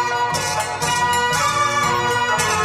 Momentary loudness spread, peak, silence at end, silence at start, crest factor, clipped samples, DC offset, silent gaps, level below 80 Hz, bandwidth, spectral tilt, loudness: 3 LU; -4 dBFS; 0 s; 0 s; 14 dB; under 0.1%; under 0.1%; none; -48 dBFS; 16 kHz; -2 dB/octave; -18 LUFS